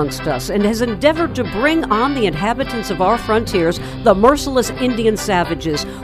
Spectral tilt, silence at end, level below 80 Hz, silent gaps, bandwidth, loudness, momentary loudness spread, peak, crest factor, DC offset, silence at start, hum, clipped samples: -5 dB/octave; 0 s; -34 dBFS; none; 16 kHz; -17 LUFS; 7 LU; 0 dBFS; 16 dB; under 0.1%; 0 s; none; under 0.1%